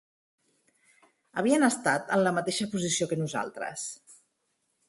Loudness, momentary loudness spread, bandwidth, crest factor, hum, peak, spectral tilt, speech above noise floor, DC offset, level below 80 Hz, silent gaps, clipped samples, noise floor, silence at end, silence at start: -28 LUFS; 13 LU; 12 kHz; 20 dB; none; -10 dBFS; -4 dB/octave; 49 dB; under 0.1%; -70 dBFS; none; under 0.1%; -77 dBFS; 0.75 s; 1.35 s